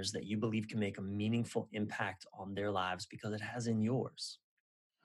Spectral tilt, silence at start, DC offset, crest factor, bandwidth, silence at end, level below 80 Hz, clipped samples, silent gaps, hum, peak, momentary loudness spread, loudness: -5.5 dB/octave; 0 s; under 0.1%; 18 dB; 12 kHz; 0.7 s; -78 dBFS; under 0.1%; none; none; -22 dBFS; 8 LU; -39 LUFS